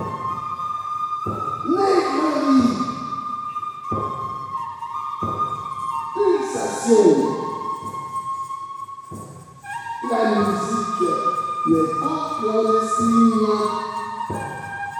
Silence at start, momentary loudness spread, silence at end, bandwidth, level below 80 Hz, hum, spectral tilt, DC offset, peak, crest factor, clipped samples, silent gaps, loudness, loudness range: 0 s; 12 LU; 0 s; 14 kHz; -58 dBFS; none; -5.5 dB/octave; under 0.1%; -2 dBFS; 20 dB; under 0.1%; none; -22 LUFS; 6 LU